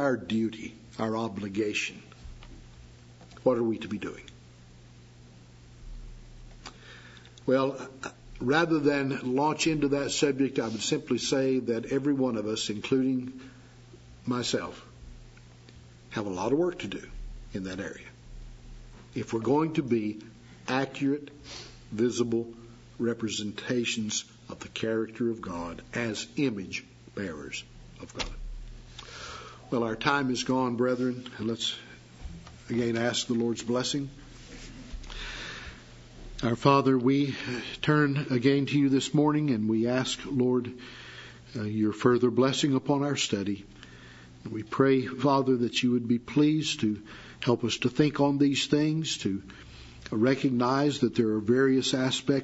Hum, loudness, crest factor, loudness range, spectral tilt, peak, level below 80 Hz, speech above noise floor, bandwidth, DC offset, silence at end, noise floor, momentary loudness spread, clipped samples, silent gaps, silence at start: none; -28 LUFS; 24 dB; 8 LU; -5 dB/octave; -6 dBFS; -52 dBFS; 24 dB; 8 kHz; under 0.1%; 0 s; -52 dBFS; 21 LU; under 0.1%; none; 0 s